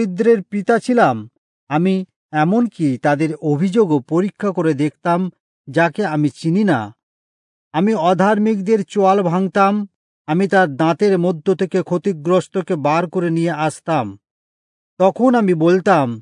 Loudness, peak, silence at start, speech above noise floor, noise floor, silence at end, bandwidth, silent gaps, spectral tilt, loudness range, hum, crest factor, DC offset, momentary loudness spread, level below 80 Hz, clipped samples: -17 LUFS; -2 dBFS; 0 s; over 74 dB; under -90 dBFS; 0 s; 11 kHz; 1.38-1.67 s, 2.16-2.29 s, 5.40-5.64 s, 7.03-7.71 s, 9.95-10.25 s, 14.31-14.97 s; -7.5 dB/octave; 3 LU; none; 16 dB; under 0.1%; 7 LU; -72 dBFS; under 0.1%